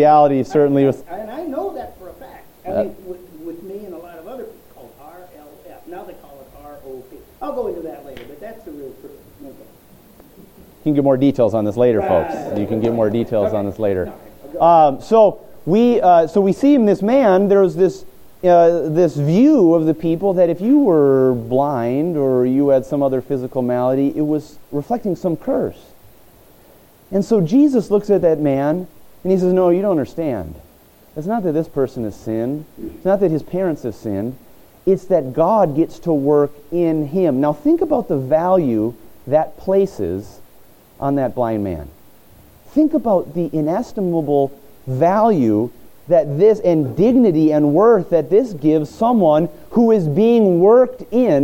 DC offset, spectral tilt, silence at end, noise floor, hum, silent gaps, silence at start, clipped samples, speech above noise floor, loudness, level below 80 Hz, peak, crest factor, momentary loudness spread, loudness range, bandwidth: under 0.1%; -8.5 dB/octave; 0 s; -48 dBFS; none; none; 0 s; under 0.1%; 33 dB; -16 LUFS; -48 dBFS; -2 dBFS; 16 dB; 19 LU; 17 LU; 17 kHz